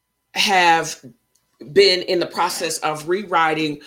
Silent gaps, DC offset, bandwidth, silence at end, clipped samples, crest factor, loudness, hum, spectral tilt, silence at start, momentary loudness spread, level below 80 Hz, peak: none; under 0.1%; 17 kHz; 0.1 s; under 0.1%; 20 dB; -18 LUFS; none; -2.5 dB/octave; 0.35 s; 9 LU; -64 dBFS; 0 dBFS